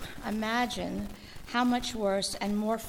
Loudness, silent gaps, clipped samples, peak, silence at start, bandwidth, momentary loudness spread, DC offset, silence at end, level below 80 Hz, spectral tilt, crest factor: -31 LUFS; none; under 0.1%; -14 dBFS; 0 s; 18 kHz; 9 LU; under 0.1%; 0 s; -50 dBFS; -4 dB/octave; 16 dB